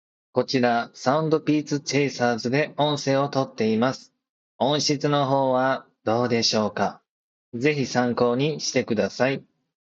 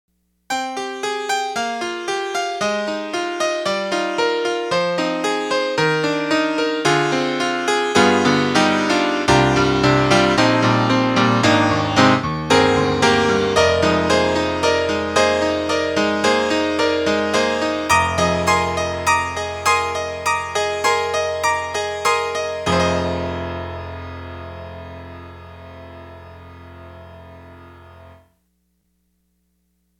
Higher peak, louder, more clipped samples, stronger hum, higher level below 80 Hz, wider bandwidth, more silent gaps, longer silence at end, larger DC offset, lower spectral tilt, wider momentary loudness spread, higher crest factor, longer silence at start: second, -4 dBFS vs 0 dBFS; second, -23 LUFS vs -18 LUFS; neither; second, none vs 60 Hz at -65 dBFS; second, -70 dBFS vs -44 dBFS; second, 8 kHz vs 17.5 kHz; first, 4.29-4.59 s, 7.09-7.52 s vs none; second, 0.6 s vs 1.9 s; neither; about the same, -5 dB/octave vs -4.5 dB/octave; second, 5 LU vs 12 LU; about the same, 20 dB vs 18 dB; second, 0.35 s vs 0.5 s